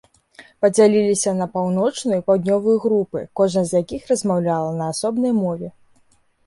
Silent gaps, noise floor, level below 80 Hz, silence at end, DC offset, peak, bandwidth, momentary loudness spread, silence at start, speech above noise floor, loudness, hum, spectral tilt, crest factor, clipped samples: none; -58 dBFS; -58 dBFS; 0.75 s; under 0.1%; -4 dBFS; 11.5 kHz; 8 LU; 0.4 s; 39 dB; -19 LUFS; none; -5.5 dB/octave; 16 dB; under 0.1%